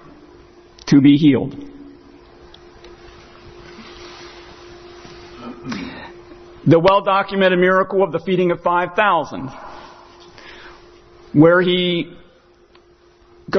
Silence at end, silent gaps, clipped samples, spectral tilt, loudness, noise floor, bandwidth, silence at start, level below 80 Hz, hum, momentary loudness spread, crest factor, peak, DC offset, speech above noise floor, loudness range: 0 s; none; under 0.1%; -7 dB/octave; -16 LUFS; -51 dBFS; 6.4 kHz; 0.85 s; -50 dBFS; none; 26 LU; 18 dB; 0 dBFS; under 0.1%; 36 dB; 19 LU